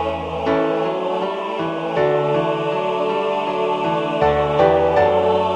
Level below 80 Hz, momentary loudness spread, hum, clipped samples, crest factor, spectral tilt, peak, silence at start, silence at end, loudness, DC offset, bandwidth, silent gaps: -44 dBFS; 8 LU; none; under 0.1%; 18 dB; -7 dB/octave; 0 dBFS; 0 s; 0 s; -19 LUFS; under 0.1%; 9 kHz; none